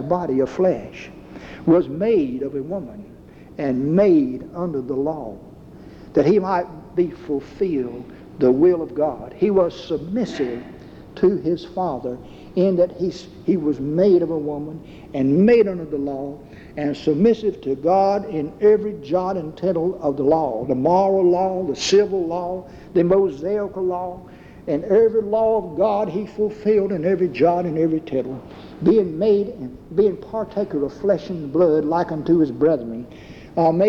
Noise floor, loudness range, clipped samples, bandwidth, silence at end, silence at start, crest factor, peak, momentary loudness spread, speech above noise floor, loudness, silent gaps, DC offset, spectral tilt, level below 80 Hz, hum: -41 dBFS; 3 LU; under 0.1%; 7.8 kHz; 0 s; 0 s; 14 dB; -6 dBFS; 15 LU; 21 dB; -20 LUFS; none; under 0.1%; -7.5 dB/octave; -50 dBFS; none